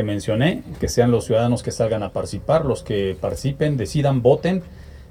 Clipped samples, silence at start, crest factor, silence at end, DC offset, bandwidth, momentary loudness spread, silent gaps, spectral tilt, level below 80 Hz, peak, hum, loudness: under 0.1%; 0 s; 18 dB; 0.05 s; under 0.1%; 15 kHz; 8 LU; none; -6.5 dB/octave; -40 dBFS; -2 dBFS; none; -21 LUFS